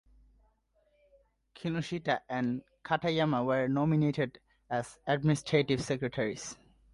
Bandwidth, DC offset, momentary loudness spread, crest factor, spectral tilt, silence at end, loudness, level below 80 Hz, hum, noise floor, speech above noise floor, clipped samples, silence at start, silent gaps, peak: 11.5 kHz; under 0.1%; 8 LU; 20 dB; -6 dB/octave; 0.4 s; -32 LUFS; -62 dBFS; none; -72 dBFS; 41 dB; under 0.1%; 1.55 s; none; -12 dBFS